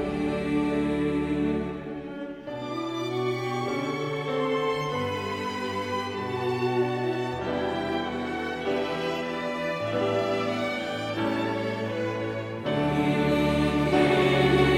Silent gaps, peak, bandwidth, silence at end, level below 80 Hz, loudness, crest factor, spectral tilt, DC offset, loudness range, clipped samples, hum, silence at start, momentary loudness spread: none; -8 dBFS; 15.5 kHz; 0 s; -48 dBFS; -27 LUFS; 18 dB; -6.5 dB/octave; under 0.1%; 4 LU; under 0.1%; none; 0 s; 7 LU